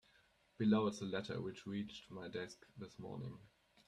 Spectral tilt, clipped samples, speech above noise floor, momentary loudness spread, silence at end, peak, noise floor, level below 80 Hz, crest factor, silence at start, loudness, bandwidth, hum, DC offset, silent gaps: -6.5 dB/octave; under 0.1%; 31 dB; 17 LU; 0.4 s; -22 dBFS; -73 dBFS; -76 dBFS; 20 dB; 0.6 s; -42 LUFS; 10.5 kHz; none; under 0.1%; none